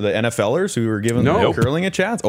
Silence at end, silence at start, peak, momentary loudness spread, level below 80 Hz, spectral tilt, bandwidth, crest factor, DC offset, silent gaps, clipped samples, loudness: 0 s; 0 s; -4 dBFS; 4 LU; -50 dBFS; -5.5 dB/octave; 16 kHz; 14 dB; under 0.1%; none; under 0.1%; -18 LUFS